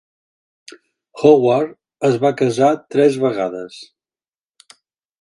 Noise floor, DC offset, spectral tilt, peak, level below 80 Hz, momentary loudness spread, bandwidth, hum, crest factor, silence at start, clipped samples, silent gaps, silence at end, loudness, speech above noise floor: under -90 dBFS; under 0.1%; -6.5 dB/octave; 0 dBFS; -64 dBFS; 13 LU; 11.5 kHz; none; 18 dB; 1.15 s; under 0.1%; none; 1.4 s; -16 LUFS; over 75 dB